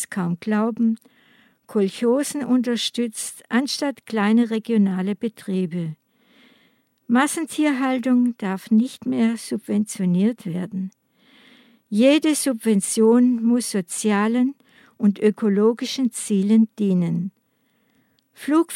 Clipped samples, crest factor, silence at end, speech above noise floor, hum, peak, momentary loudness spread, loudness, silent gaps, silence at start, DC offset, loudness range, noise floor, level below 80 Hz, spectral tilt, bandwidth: under 0.1%; 16 dB; 0 s; 46 dB; none; -6 dBFS; 10 LU; -21 LUFS; none; 0 s; under 0.1%; 4 LU; -66 dBFS; -76 dBFS; -5.5 dB/octave; 15 kHz